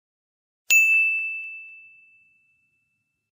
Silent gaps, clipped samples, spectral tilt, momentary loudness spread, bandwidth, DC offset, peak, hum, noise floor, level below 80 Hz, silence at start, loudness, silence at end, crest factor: none; under 0.1%; 5 dB/octave; 20 LU; 15.5 kHz; under 0.1%; -6 dBFS; none; -75 dBFS; -90 dBFS; 0.7 s; -18 LUFS; 1.6 s; 20 dB